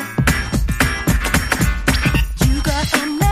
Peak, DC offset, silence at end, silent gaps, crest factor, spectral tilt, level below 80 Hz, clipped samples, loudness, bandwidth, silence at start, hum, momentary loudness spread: 0 dBFS; under 0.1%; 0 s; none; 16 dB; -4.5 dB/octave; -22 dBFS; under 0.1%; -17 LUFS; 15.5 kHz; 0 s; none; 2 LU